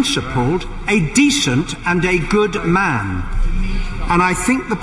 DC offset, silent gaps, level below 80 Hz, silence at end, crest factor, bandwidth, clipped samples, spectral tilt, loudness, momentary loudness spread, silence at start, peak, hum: under 0.1%; none; -24 dBFS; 0 s; 14 dB; 11.5 kHz; under 0.1%; -4.5 dB/octave; -17 LUFS; 10 LU; 0 s; -2 dBFS; none